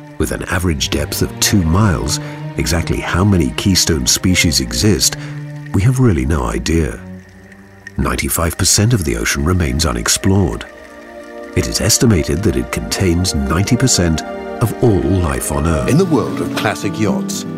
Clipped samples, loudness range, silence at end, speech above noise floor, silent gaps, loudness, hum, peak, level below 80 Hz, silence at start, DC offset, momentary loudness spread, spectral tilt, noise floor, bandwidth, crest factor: under 0.1%; 3 LU; 0 s; 24 dB; none; -15 LUFS; none; 0 dBFS; -28 dBFS; 0 s; under 0.1%; 9 LU; -4.5 dB/octave; -39 dBFS; 16 kHz; 14 dB